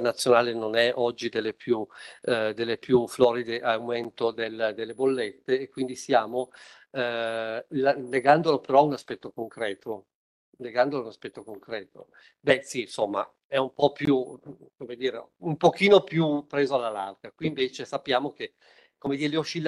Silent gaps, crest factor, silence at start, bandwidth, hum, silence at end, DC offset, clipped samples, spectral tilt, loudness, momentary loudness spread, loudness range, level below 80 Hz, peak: 10.15-10.53 s, 13.44-13.50 s; 22 dB; 0 s; 12.5 kHz; none; 0 s; under 0.1%; under 0.1%; -5 dB/octave; -26 LUFS; 16 LU; 5 LU; -68 dBFS; -6 dBFS